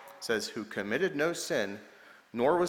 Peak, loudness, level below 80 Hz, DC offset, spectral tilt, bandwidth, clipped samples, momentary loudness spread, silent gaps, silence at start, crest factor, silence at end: -14 dBFS; -32 LUFS; -68 dBFS; under 0.1%; -4 dB/octave; 18 kHz; under 0.1%; 9 LU; none; 0 s; 18 dB; 0 s